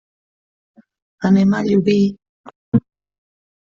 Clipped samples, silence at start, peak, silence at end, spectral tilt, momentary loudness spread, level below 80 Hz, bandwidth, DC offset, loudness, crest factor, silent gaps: under 0.1%; 1.2 s; -4 dBFS; 0.95 s; -8 dB/octave; 6 LU; -54 dBFS; 7.2 kHz; under 0.1%; -17 LUFS; 16 dB; 2.29-2.44 s, 2.56-2.72 s